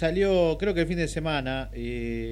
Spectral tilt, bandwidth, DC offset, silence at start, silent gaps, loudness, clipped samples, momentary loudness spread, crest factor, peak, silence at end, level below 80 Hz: -6 dB/octave; 13 kHz; under 0.1%; 0 s; none; -27 LUFS; under 0.1%; 10 LU; 14 dB; -12 dBFS; 0 s; -38 dBFS